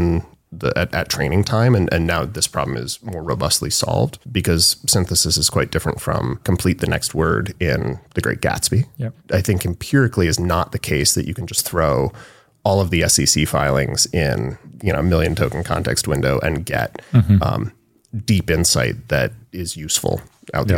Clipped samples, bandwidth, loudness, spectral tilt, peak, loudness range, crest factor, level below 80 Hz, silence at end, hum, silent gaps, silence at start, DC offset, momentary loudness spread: under 0.1%; 17 kHz; -19 LUFS; -4 dB/octave; -2 dBFS; 3 LU; 16 dB; -34 dBFS; 0 s; none; none; 0 s; under 0.1%; 10 LU